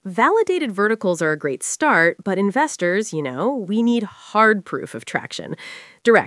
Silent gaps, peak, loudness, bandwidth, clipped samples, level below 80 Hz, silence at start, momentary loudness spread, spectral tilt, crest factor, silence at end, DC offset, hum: none; 0 dBFS; -19 LUFS; 12 kHz; under 0.1%; -76 dBFS; 0.05 s; 13 LU; -4.5 dB/octave; 20 dB; 0 s; under 0.1%; none